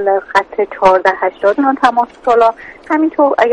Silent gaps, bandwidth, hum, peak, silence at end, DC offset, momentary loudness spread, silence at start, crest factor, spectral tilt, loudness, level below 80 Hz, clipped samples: none; 9.4 kHz; none; 0 dBFS; 0 s; under 0.1%; 5 LU; 0 s; 12 dB; -5 dB/octave; -13 LUFS; -50 dBFS; under 0.1%